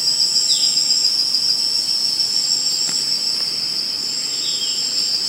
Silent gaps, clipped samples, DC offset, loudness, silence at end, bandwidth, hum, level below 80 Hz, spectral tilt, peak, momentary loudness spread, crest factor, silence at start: none; under 0.1%; under 0.1%; -16 LUFS; 0 s; 16 kHz; none; -70 dBFS; 1.5 dB/octave; -4 dBFS; 5 LU; 16 dB; 0 s